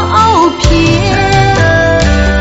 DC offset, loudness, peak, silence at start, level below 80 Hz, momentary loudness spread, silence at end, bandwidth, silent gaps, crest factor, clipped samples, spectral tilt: under 0.1%; -8 LUFS; 0 dBFS; 0 s; -16 dBFS; 2 LU; 0 s; 8.2 kHz; none; 8 dB; 0.4%; -5.5 dB/octave